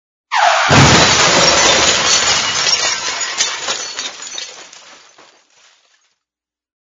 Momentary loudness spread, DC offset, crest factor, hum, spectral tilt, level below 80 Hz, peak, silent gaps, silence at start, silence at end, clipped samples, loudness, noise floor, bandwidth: 16 LU; under 0.1%; 16 dB; none; -2 dB/octave; -40 dBFS; 0 dBFS; none; 0.3 s; 2.25 s; under 0.1%; -11 LUFS; -87 dBFS; 11 kHz